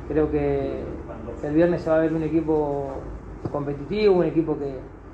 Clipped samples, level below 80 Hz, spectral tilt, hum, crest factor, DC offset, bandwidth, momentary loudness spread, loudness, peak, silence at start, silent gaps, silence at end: under 0.1%; -40 dBFS; -9 dB/octave; none; 16 dB; under 0.1%; 7.8 kHz; 15 LU; -24 LUFS; -8 dBFS; 0 s; none; 0 s